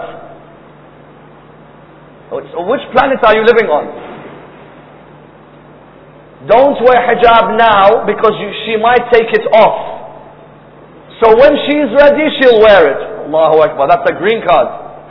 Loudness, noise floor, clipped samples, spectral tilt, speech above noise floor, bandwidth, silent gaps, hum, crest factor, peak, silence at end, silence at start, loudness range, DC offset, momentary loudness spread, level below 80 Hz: -9 LUFS; -38 dBFS; 1%; -7 dB/octave; 29 dB; 5.4 kHz; none; none; 10 dB; 0 dBFS; 0.1 s; 0 s; 6 LU; under 0.1%; 16 LU; -42 dBFS